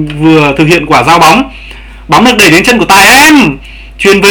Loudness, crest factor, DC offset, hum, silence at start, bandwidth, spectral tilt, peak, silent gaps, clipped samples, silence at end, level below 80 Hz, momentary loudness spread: -4 LUFS; 6 dB; under 0.1%; none; 0 s; over 20 kHz; -3.5 dB/octave; 0 dBFS; none; 10%; 0 s; -28 dBFS; 9 LU